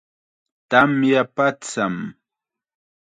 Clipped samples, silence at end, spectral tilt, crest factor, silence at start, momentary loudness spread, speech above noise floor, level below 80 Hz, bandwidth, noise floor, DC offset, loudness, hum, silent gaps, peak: under 0.1%; 1.05 s; -5 dB/octave; 22 dB; 0.7 s; 11 LU; 68 dB; -64 dBFS; 9.4 kHz; -87 dBFS; under 0.1%; -19 LUFS; none; none; 0 dBFS